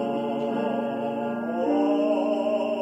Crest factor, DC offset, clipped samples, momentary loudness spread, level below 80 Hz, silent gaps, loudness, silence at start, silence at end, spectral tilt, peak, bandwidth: 12 dB; under 0.1%; under 0.1%; 6 LU; -74 dBFS; none; -26 LUFS; 0 s; 0 s; -7 dB/octave; -12 dBFS; 8.2 kHz